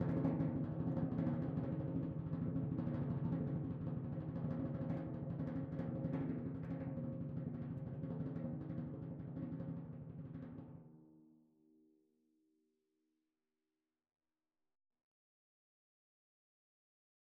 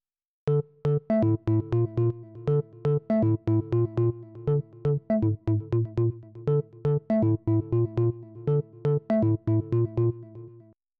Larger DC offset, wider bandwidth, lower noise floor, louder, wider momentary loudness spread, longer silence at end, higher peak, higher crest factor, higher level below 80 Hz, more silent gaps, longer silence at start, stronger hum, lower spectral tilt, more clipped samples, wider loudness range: neither; about the same, 4.3 kHz vs 4 kHz; first, under -90 dBFS vs -53 dBFS; second, -43 LUFS vs -27 LUFS; first, 10 LU vs 5 LU; first, 6.1 s vs 0.5 s; second, -24 dBFS vs -14 dBFS; first, 20 dB vs 12 dB; second, -66 dBFS vs -52 dBFS; neither; second, 0 s vs 0.45 s; neither; about the same, -11 dB/octave vs -12 dB/octave; neither; first, 12 LU vs 1 LU